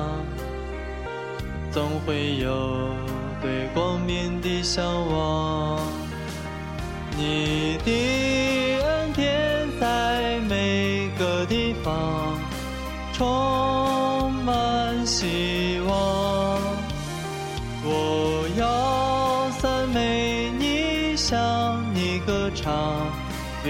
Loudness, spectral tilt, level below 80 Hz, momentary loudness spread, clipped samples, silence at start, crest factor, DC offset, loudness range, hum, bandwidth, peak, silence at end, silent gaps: -25 LUFS; -5 dB/octave; -38 dBFS; 9 LU; under 0.1%; 0 s; 14 dB; under 0.1%; 3 LU; none; 16.5 kHz; -10 dBFS; 0 s; none